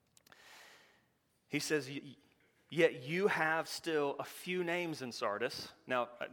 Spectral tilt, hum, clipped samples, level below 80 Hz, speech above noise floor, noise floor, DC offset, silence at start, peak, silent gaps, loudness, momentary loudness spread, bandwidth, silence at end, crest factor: -4 dB/octave; none; under 0.1%; -84 dBFS; 40 dB; -76 dBFS; under 0.1%; 0.45 s; -16 dBFS; none; -36 LUFS; 14 LU; 19 kHz; 0 s; 22 dB